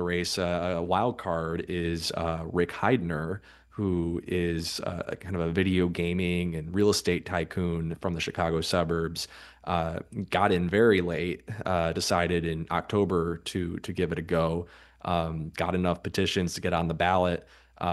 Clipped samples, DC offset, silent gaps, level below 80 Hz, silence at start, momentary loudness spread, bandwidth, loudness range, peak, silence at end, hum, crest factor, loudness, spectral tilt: under 0.1%; under 0.1%; none; -48 dBFS; 0 s; 9 LU; 12.5 kHz; 3 LU; -8 dBFS; 0 s; none; 20 dB; -28 LUFS; -5.5 dB/octave